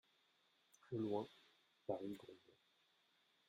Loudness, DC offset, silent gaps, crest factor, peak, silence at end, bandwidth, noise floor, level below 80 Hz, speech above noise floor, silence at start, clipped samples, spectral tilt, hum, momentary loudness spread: -48 LUFS; under 0.1%; none; 22 dB; -28 dBFS; 1.1 s; 13.5 kHz; -79 dBFS; -88 dBFS; 33 dB; 0.85 s; under 0.1%; -7.5 dB/octave; none; 16 LU